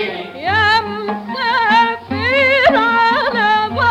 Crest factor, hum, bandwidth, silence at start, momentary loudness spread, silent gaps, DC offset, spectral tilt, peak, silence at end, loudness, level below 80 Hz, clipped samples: 12 dB; none; 12 kHz; 0 s; 11 LU; none; under 0.1%; -5 dB/octave; -2 dBFS; 0 s; -14 LUFS; -48 dBFS; under 0.1%